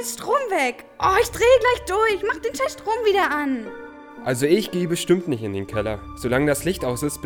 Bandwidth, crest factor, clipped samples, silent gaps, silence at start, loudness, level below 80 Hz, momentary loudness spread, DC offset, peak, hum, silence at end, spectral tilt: over 20 kHz; 18 dB; under 0.1%; none; 0 s; -21 LUFS; -44 dBFS; 10 LU; under 0.1%; -4 dBFS; none; 0 s; -4.5 dB/octave